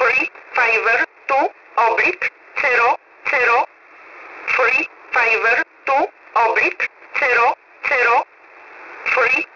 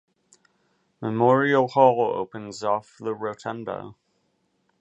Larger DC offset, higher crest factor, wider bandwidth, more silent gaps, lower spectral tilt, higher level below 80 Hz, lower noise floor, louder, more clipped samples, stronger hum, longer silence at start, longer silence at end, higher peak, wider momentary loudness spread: neither; second, 12 dB vs 22 dB; second, 6 kHz vs 8.2 kHz; neither; second, -2.5 dB/octave vs -6.5 dB/octave; first, -60 dBFS vs -70 dBFS; second, -44 dBFS vs -71 dBFS; first, -17 LUFS vs -23 LUFS; neither; neither; second, 0 s vs 1 s; second, 0.1 s vs 0.9 s; about the same, -6 dBFS vs -4 dBFS; second, 9 LU vs 15 LU